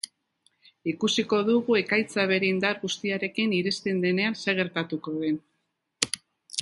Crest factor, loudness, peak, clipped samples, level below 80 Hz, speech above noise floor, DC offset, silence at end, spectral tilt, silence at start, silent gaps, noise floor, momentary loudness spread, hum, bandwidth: 26 dB; -26 LUFS; -2 dBFS; under 0.1%; -70 dBFS; 51 dB; under 0.1%; 0 s; -4 dB/octave; 0.85 s; none; -77 dBFS; 9 LU; none; 11.5 kHz